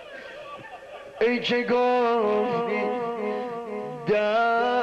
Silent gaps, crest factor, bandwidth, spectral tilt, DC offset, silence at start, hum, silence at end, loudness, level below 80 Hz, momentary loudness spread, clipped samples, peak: none; 12 dB; 8.2 kHz; -6 dB/octave; under 0.1%; 0 s; none; 0 s; -24 LUFS; -66 dBFS; 18 LU; under 0.1%; -14 dBFS